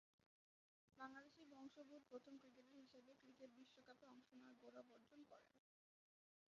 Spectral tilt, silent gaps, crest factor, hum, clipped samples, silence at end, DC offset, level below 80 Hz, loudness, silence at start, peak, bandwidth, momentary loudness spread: -2.5 dB/octave; 0.26-0.88 s; 22 dB; none; under 0.1%; 0.9 s; under 0.1%; under -90 dBFS; -65 LUFS; 0.2 s; -44 dBFS; 7.2 kHz; 8 LU